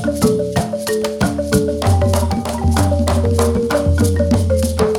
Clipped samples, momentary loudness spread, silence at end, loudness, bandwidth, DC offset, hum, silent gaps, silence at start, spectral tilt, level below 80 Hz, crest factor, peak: under 0.1%; 4 LU; 0 s; -16 LUFS; 16.5 kHz; under 0.1%; none; none; 0 s; -6 dB/octave; -26 dBFS; 14 dB; -2 dBFS